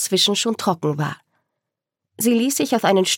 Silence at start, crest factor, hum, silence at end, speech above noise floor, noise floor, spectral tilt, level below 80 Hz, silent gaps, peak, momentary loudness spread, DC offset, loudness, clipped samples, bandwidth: 0 s; 18 dB; none; 0 s; 64 dB; -83 dBFS; -3.5 dB/octave; -76 dBFS; none; -2 dBFS; 9 LU; under 0.1%; -19 LUFS; under 0.1%; 17.5 kHz